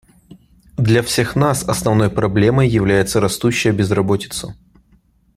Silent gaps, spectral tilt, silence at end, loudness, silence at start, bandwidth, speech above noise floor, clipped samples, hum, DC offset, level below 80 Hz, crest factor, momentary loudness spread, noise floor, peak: none; -5.5 dB/octave; 0.85 s; -16 LUFS; 0.3 s; 15.5 kHz; 39 dB; under 0.1%; none; under 0.1%; -40 dBFS; 16 dB; 6 LU; -55 dBFS; -2 dBFS